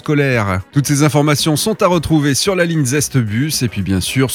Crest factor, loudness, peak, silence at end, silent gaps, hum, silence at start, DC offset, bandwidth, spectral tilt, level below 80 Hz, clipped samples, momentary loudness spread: 14 dB; -15 LUFS; 0 dBFS; 0 s; none; none; 0.05 s; under 0.1%; 17.5 kHz; -5 dB/octave; -42 dBFS; under 0.1%; 4 LU